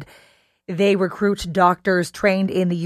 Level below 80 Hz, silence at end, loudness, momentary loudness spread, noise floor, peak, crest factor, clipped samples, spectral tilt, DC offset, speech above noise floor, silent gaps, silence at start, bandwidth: -50 dBFS; 0 s; -19 LUFS; 4 LU; -56 dBFS; -2 dBFS; 18 dB; under 0.1%; -6 dB/octave; under 0.1%; 37 dB; none; 0 s; 14 kHz